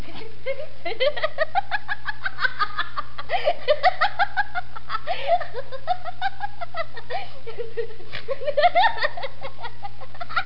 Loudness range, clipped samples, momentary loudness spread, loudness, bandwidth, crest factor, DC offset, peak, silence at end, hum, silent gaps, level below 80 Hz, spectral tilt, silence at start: 5 LU; under 0.1%; 15 LU; -26 LUFS; 5.8 kHz; 20 dB; 10%; -6 dBFS; 0 s; 60 Hz at -50 dBFS; none; -50 dBFS; -5 dB/octave; 0 s